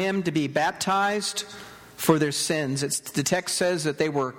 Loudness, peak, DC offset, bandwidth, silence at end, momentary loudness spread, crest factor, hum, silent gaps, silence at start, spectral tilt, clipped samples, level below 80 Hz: -25 LUFS; -4 dBFS; under 0.1%; 17.5 kHz; 0 s; 7 LU; 22 dB; none; none; 0 s; -4 dB/octave; under 0.1%; -62 dBFS